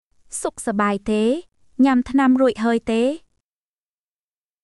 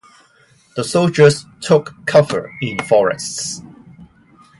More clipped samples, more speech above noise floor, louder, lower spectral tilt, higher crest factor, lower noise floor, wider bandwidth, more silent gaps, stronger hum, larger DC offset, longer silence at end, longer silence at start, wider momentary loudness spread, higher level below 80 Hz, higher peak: neither; first, over 71 dB vs 37 dB; second, -20 LUFS vs -16 LUFS; about the same, -5 dB/octave vs -5 dB/octave; about the same, 16 dB vs 18 dB; first, under -90 dBFS vs -53 dBFS; about the same, 12 kHz vs 11.5 kHz; neither; neither; neither; first, 1.45 s vs 0.55 s; second, 0.3 s vs 0.75 s; about the same, 11 LU vs 13 LU; about the same, -52 dBFS vs -56 dBFS; second, -6 dBFS vs 0 dBFS